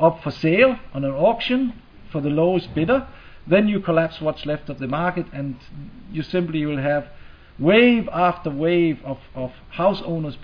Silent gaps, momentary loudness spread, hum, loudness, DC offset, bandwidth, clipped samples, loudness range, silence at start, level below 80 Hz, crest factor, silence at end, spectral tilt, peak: none; 15 LU; none; -21 LUFS; under 0.1%; 5.4 kHz; under 0.1%; 5 LU; 0 s; -46 dBFS; 18 dB; 0 s; -8.5 dB/octave; -2 dBFS